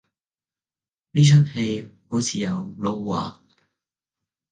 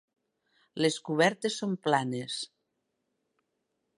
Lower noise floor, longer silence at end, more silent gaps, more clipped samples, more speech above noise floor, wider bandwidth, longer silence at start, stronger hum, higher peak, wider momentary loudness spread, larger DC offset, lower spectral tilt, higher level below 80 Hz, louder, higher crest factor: first, under -90 dBFS vs -81 dBFS; second, 1.2 s vs 1.5 s; neither; neither; first, over 70 dB vs 52 dB; second, 9.4 kHz vs 11.5 kHz; first, 1.15 s vs 0.75 s; neither; first, -6 dBFS vs -10 dBFS; about the same, 13 LU vs 11 LU; neither; first, -6 dB/octave vs -4.5 dB/octave; first, -60 dBFS vs -80 dBFS; first, -22 LUFS vs -29 LUFS; second, 18 dB vs 24 dB